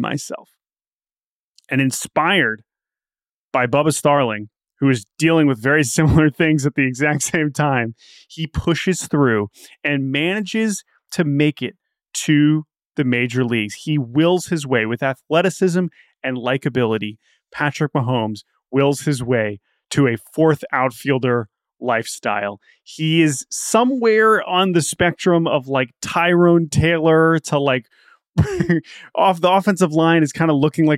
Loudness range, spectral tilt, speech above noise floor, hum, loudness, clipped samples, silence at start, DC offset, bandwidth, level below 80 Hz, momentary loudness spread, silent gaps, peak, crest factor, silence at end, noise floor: 4 LU; -5.5 dB/octave; over 72 dB; none; -18 LUFS; under 0.1%; 0 s; under 0.1%; 15.5 kHz; -44 dBFS; 11 LU; 0.87-1.00 s, 1.20-1.54 s, 3.31-3.51 s, 12.85-12.90 s, 28.29-28.33 s; -4 dBFS; 14 dB; 0 s; under -90 dBFS